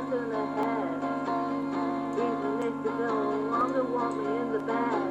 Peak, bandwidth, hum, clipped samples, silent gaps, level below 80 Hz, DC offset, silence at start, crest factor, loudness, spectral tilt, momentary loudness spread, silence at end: -16 dBFS; 8.6 kHz; 50 Hz at -70 dBFS; under 0.1%; none; -70 dBFS; under 0.1%; 0 s; 14 dB; -30 LUFS; -7 dB/octave; 3 LU; 0 s